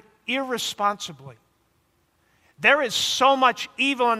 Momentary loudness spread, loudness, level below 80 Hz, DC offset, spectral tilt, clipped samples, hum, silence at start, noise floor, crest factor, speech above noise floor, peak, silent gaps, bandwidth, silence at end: 10 LU; -21 LUFS; -70 dBFS; under 0.1%; -2 dB/octave; under 0.1%; none; 0.3 s; -67 dBFS; 20 dB; 44 dB; -4 dBFS; none; 16 kHz; 0 s